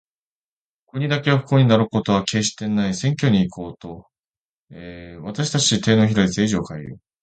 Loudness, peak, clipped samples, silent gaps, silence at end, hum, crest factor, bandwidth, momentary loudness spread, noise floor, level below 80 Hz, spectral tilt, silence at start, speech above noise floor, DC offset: -19 LUFS; -2 dBFS; under 0.1%; 4.19-4.68 s; 0.25 s; none; 20 dB; 9.2 kHz; 21 LU; under -90 dBFS; -50 dBFS; -5 dB/octave; 0.95 s; over 70 dB; under 0.1%